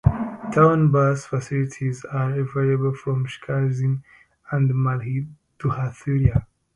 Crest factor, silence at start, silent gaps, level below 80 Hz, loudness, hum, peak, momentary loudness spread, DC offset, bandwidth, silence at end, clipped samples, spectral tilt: 20 dB; 0.05 s; none; -40 dBFS; -22 LUFS; none; -2 dBFS; 11 LU; under 0.1%; 10.5 kHz; 0.3 s; under 0.1%; -8.5 dB/octave